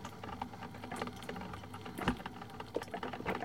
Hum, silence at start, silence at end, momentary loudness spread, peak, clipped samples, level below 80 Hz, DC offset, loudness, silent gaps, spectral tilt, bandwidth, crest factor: none; 0 s; 0 s; 9 LU; -16 dBFS; under 0.1%; -58 dBFS; 0.1%; -43 LUFS; none; -5.5 dB/octave; 16.5 kHz; 26 dB